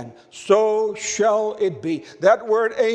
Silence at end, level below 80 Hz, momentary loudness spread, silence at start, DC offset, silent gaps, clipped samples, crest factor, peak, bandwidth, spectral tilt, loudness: 0 s; -68 dBFS; 10 LU; 0 s; under 0.1%; none; under 0.1%; 18 dB; -2 dBFS; 9.4 kHz; -4 dB/octave; -20 LUFS